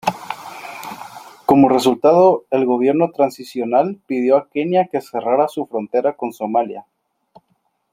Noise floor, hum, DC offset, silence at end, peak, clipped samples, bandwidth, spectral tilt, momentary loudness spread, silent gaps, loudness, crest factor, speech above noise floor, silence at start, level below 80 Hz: -66 dBFS; none; under 0.1%; 1.1 s; 0 dBFS; under 0.1%; 16 kHz; -6.5 dB/octave; 18 LU; none; -17 LUFS; 18 dB; 50 dB; 0.05 s; -60 dBFS